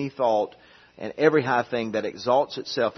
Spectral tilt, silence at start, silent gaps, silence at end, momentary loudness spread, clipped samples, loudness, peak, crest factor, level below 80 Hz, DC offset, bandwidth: -5.5 dB/octave; 0 s; none; 0.05 s; 11 LU; under 0.1%; -24 LUFS; -4 dBFS; 20 dB; -68 dBFS; under 0.1%; 6.4 kHz